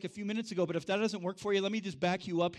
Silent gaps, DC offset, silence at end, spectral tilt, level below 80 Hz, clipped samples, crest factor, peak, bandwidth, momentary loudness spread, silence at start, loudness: none; under 0.1%; 0 s; -5.5 dB/octave; -72 dBFS; under 0.1%; 16 dB; -18 dBFS; 12 kHz; 5 LU; 0 s; -34 LUFS